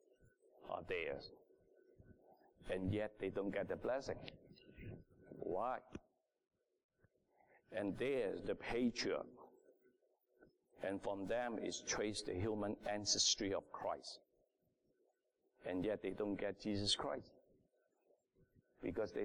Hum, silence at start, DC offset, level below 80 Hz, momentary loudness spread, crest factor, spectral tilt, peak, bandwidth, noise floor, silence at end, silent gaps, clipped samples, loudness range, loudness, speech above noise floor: none; 0.6 s; under 0.1%; -66 dBFS; 18 LU; 22 dB; -3.5 dB/octave; -24 dBFS; 11.5 kHz; -83 dBFS; 0 s; 6.84-6.89 s; under 0.1%; 7 LU; -42 LUFS; 41 dB